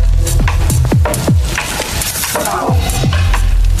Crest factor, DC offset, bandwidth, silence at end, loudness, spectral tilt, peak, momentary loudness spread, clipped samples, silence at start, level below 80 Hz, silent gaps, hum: 10 dB; under 0.1%; 15 kHz; 0 s; -14 LUFS; -4.5 dB/octave; -2 dBFS; 3 LU; under 0.1%; 0 s; -14 dBFS; none; none